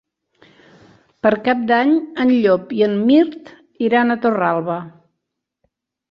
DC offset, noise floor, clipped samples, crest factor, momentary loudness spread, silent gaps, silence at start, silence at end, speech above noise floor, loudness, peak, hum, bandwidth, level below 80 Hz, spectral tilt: under 0.1%; -78 dBFS; under 0.1%; 16 dB; 8 LU; none; 1.25 s; 1.25 s; 62 dB; -17 LUFS; -2 dBFS; none; 5.8 kHz; -62 dBFS; -8 dB/octave